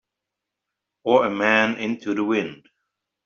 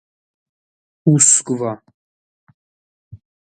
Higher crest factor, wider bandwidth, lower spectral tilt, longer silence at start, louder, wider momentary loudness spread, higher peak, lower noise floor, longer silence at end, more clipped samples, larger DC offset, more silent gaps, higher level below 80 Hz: about the same, 22 dB vs 22 dB; second, 7.2 kHz vs 11.5 kHz; second, -2.5 dB/octave vs -4.5 dB/octave; about the same, 1.05 s vs 1.05 s; second, -21 LUFS vs -14 LUFS; second, 10 LU vs 15 LU; about the same, -2 dBFS vs 0 dBFS; second, -84 dBFS vs under -90 dBFS; first, 0.7 s vs 0.35 s; neither; neither; second, none vs 1.94-2.47 s, 2.54-3.11 s; second, -68 dBFS vs -62 dBFS